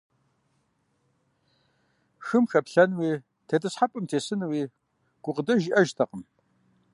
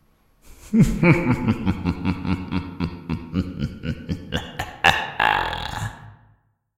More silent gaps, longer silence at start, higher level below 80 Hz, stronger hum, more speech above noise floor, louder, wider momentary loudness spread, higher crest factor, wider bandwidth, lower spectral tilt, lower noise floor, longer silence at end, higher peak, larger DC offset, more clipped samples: neither; first, 2.2 s vs 0.45 s; second, -76 dBFS vs -38 dBFS; neither; first, 47 dB vs 39 dB; second, -26 LUFS vs -23 LUFS; about the same, 12 LU vs 13 LU; about the same, 22 dB vs 22 dB; second, 11.5 kHz vs 16.5 kHz; about the same, -6 dB/octave vs -6 dB/octave; first, -72 dBFS vs -61 dBFS; about the same, 0.7 s vs 0.65 s; second, -6 dBFS vs 0 dBFS; neither; neither